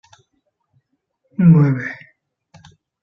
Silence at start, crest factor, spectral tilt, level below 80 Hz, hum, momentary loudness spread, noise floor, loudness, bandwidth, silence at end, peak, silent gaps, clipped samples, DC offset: 1.4 s; 18 dB; -10.5 dB/octave; -56 dBFS; none; 21 LU; -70 dBFS; -15 LUFS; 3.8 kHz; 1.1 s; -2 dBFS; none; under 0.1%; under 0.1%